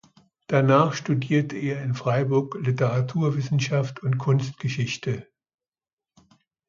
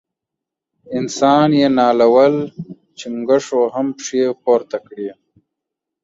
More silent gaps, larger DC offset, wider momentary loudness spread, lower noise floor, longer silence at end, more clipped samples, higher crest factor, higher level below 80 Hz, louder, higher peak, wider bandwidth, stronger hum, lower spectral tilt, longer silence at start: neither; neither; second, 8 LU vs 17 LU; first, under -90 dBFS vs -83 dBFS; first, 1.45 s vs 0.9 s; neither; about the same, 20 dB vs 16 dB; about the same, -62 dBFS vs -60 dBFS; second, -24 LUFS vs -15 LUFS; about the same, -4 dBFS vs -2 dBFS; about the same, 7.4 kHz vs 7.8 kHz; neither; first, -7 dB/octave vs -5.5 dB/octave; second, 0.5 s vs 0.9 s